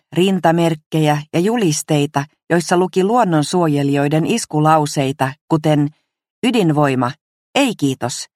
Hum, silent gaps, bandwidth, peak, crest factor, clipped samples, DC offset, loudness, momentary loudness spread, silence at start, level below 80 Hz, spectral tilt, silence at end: none; 0.86-0.91 s, 5.41-5.48 s, 6.30-6.42 s, 7.21-7.53 s; 15.5 kHz; 0 dBFS; 16 dB; under 0.1%; under 0.1%; -17 LUFS; 6 LU; 0.1 s; -60 dBFS; -5.5 dB/octave; 0.1 s